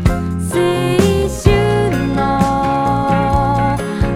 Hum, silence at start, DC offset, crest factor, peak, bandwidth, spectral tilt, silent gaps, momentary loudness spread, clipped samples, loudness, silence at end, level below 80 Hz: none; 0 s; under 0.1%; 14 dB; 0 dBFS; 16 kHz; -6.5 dB/octave; none; 4 LU; under 0.1%; -15 LUFS; 0 s; -26 dBFS